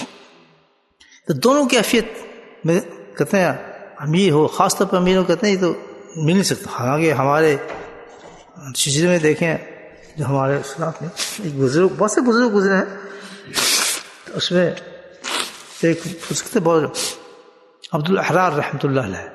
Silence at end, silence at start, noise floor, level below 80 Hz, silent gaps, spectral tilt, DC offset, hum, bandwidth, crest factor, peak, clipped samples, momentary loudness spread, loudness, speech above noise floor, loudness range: 0 s; 0 s; -58 dBFS; -54 dBFS; none; -4.5 dB/octave; under 0.1%; none; 12.5 kHz; 18 dB; 0 dBFS; under 0.1%; 17 LU; -18 LUFS; 40 dB; 3 LU